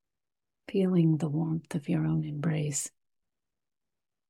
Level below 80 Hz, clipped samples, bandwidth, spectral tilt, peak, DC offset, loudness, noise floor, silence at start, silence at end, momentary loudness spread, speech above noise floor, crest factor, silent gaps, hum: -66 dBFS; under 0.1%; 13.5 kHz; -6.5 dB/octave; -14 dBFS; under 0.1%; -30 LUFS; under -90 dBFS; 0.7 s; 1.4 s; 9 LU; over 62 dB; 16 dB; none; none